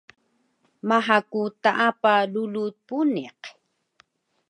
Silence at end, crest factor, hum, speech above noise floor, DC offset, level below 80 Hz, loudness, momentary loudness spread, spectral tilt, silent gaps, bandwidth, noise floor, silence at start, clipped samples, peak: 1 s; 20 dB; none; 45 dB; under 0.1%; -80 dBFS; -23 LUFS; 15 LU; -5.5 dB/octave; none; 10.5 kHz; -68 dBFS; 0.85 s; under 0.1%; -4 dBFS